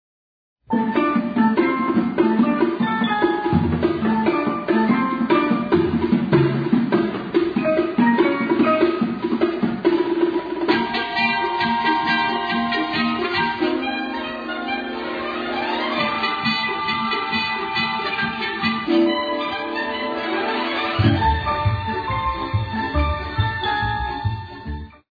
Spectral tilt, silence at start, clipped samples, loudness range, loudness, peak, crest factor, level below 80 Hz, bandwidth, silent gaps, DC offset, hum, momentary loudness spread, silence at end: -8 dB/octave; 0.7 s; under 0.1%; 4 LU; -20 LUFS; -4 dBFS; 16 dB; -38 dBFS; 5 kHz; none; under 0.1%; none; 6 LU; 0.25 s